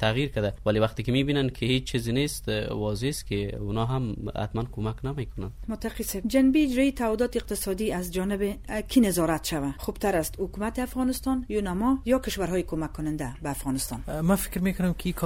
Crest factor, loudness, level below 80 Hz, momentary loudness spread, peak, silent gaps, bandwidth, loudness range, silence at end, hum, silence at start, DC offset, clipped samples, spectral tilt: 18 dB; -27 LUFS; -40 dBFS; 9 LU; -10 dBFS; none; 16.5 kHz; 4 LU; 0 s; none; 0 s; under 0.1%; under 0.1%; -5.5 dB/octave